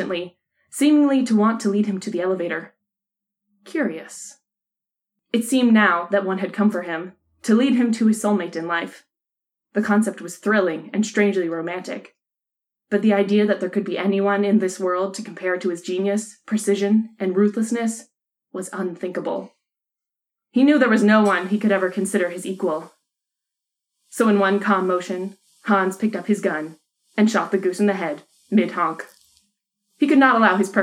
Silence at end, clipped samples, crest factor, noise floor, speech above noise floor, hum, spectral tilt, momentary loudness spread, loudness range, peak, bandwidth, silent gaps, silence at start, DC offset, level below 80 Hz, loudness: 0 s; under 0.1%; 18 dB; -87 dBFS; 67 dB; none; -5.5 dB/octave; 14 LU; 4 LU; -2 dBFS; 13.5 kHz; none; 0 s; under 0.1%; -78 dBFS; -20 LUFS